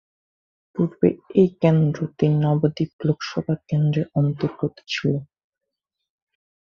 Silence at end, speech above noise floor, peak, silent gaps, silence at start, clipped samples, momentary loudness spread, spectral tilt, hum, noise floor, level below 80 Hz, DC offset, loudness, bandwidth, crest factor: 1.4 s; 61 dB; -4 dBFS; 2.93-2.99 s; 0.75 s; under 0.1%; 8 LU; -8 dB/octave; none; -82 dBFS; -58 dBFS; under 0.1%; -22 LUFS; 7 kHz; 20 dB